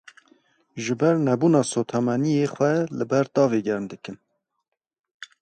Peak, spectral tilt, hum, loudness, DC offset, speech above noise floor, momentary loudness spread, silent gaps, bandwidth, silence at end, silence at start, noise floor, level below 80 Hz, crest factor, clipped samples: -6 dBFS; -6.5 dB/octave; none; -22 LUFS; under 0.1%; 58 dB; 14 LU; 4.99-5.04 s, 5.11-5.20 s; 9 kHz; 0.15 s; 0.75 s; -80 dBFS; -68 dBFS; 18 dB; under 0.1%